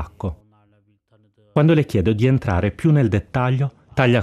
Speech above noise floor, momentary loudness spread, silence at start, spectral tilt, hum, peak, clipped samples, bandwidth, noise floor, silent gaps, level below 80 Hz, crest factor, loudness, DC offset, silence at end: 43 dB; 8 LU; 0 s; -8.5 dB/octave; none; 0 dBFS; under 0.1%; 11.5 kHz; -60 dBFS; none; -44 dBFS; 18 dB; -19 LUFS; under 0.1%; 0 s